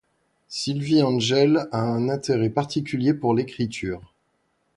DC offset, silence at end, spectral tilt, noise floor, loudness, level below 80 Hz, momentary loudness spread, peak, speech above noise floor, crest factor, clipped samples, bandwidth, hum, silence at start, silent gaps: under 0.1%; 0.75 s; -6 dB/octave; -70 dBFS; -23 LUFS; -56 dBFS; 10 LU; -6 dBFS; 48 dB; 16 dB; under 0.1%; 11.5 kHz; none; 0.5 s; none